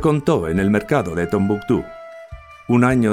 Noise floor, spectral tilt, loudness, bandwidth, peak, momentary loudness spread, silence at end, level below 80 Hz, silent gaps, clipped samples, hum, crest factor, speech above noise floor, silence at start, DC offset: -38 dBFS; -7.5 dB/octave; -19 LUFS; 15 kHz; -2 dBFS; 21 LU; 0 s; -42 dBFS; none; under 0.1%; none; 16 dB; 21 dB; 0 s; under 0.1%